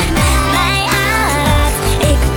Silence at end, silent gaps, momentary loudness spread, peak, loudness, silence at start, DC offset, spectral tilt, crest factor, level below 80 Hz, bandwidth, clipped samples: 0 s; none; 1 LU; -2 dBFS; -13 LUFS; 0 s; under 0.1%; -4 dB/octave; 12 dB; -18 dBFS; 18 kHz; under 0.1%